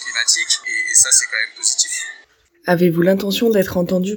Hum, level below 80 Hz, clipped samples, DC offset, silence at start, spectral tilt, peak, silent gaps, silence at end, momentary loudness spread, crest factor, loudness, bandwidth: none; -54 dBFS; under 0.1%; under 0.1%; 0 s; -2.5 dB/octave; 0 dBFS; none; 0 s; 9 LU; 18 dB; -15 LUFS; 19.5 kHz